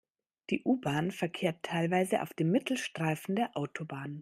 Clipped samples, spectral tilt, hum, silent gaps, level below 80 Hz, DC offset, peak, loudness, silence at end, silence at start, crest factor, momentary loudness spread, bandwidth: under 0.1%; -6 dB/octave; none; none; -74 dBFS; under 0.1%; -14 dBFS; -32 LUFS; 0 s; 0.5 s; 18 dB; 8 LU; 15.5 kHz